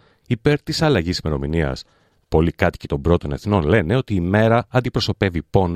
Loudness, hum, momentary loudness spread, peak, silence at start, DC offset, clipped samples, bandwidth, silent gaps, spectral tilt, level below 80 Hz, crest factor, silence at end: -20 LUFS; none; 6 LU; -2 dBFS; 0.3 s; under 0.1%; under 0.1%; 14.5 kHz; none; -6.5 dB/octave; -36 dBFS; 18 dB; 0 s